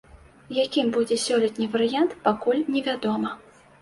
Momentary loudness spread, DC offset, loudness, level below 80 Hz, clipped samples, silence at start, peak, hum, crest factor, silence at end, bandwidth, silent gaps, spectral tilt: 6 LU; under 0.1%; -24 LUFS; -62 dBFS; under 0.1%; 0.15 s; -6 dBFS; none; 18 dB; 0.45 s; 11.5 kHz; none; -4 dB/octave